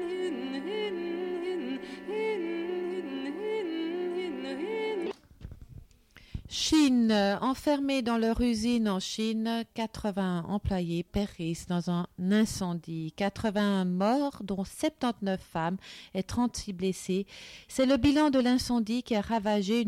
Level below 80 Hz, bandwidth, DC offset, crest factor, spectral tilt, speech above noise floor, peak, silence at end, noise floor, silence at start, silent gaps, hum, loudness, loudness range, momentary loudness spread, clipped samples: -52 dBFS; 16 kHz; under 0.1%; 16 dB; -5.5 dB/octave; 28 dB; -14 dBFS; 0 s; -57 dBFS; 0 s; none; none; -30 LUFS; 6 LU; 11 LU; under 0.1%